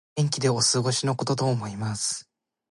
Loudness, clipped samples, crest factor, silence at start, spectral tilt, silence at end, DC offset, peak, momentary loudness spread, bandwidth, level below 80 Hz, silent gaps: -25 LUFS; under 0.1%; 16 dB; 0.15 s; -4 dB/octave; 0.5 s; under 0.1%; -10 dBFS; 8 LU; 11.5 kHz; -62 dBFS; none